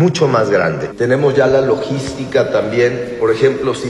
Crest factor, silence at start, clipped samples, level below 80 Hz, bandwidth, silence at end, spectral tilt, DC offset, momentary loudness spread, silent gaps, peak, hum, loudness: 14 dB; 0 s; under 0.1%; -46 dBFS; 11.5 kHz; 0 s; -6 dB/octave; under 0.1%; 6 LU; none; 0 dBFS; none; -15 LUFS